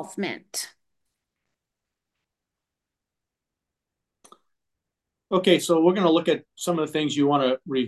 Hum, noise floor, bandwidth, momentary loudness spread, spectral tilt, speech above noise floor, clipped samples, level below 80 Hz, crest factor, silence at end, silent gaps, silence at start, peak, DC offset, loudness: none; -86 dBFS; 12.5 kHz; 12 LU; -5 dB/octave; 64 dB; under 0.1%; -76 dBFS; 20 dB; 0 s; none; 0 s; -6 dBFS; under 0.1%; -23 LUFS